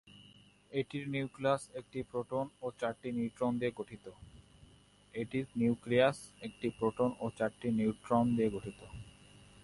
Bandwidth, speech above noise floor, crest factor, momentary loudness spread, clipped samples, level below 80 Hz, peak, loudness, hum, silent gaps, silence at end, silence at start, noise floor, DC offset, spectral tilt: 11.5 kHz; 28 dB; 20 dB; 16 LU; under 0.1%; -64 dBFS; -16 dBFS; -35 LUFS; 50 Hz at -65 dBFS; none; 0.55 s; 0.05 s; -63 dBFS; under 0.1%; -6.5 dB/octave